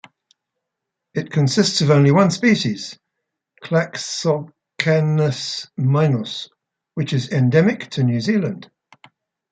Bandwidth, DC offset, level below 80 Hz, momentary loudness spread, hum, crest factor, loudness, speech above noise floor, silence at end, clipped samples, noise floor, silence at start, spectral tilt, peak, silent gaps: 9.2 kHz; under 0.1%; -62 dBFS; 15 LU; none; 18 dB; -19 LUFS; 63 dB; 0.85 s; under 0.1%; -81 dBFS; 1.15 s; -6 dB/octave; 0 dBFS; none